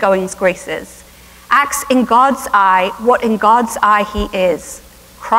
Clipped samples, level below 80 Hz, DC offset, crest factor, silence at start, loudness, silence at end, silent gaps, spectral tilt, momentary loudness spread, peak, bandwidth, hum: under 0.1%; -38 dBFS; under 0.1%; 14 dB; 0 s; -13 LUFS; 0 s; none; -4 dB/octave; 13 LU; 0 dBFS; 16 kHz; none